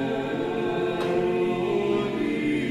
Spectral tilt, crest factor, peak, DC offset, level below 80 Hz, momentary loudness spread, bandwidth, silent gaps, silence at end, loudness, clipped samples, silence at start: -7 dB/octave; 12 dB; -14 dBFS; under 0.1%; -56 dBFS; 3 LU; 12 kHz; none; 0 s; -26 LUFS; under 0.1%; 0 s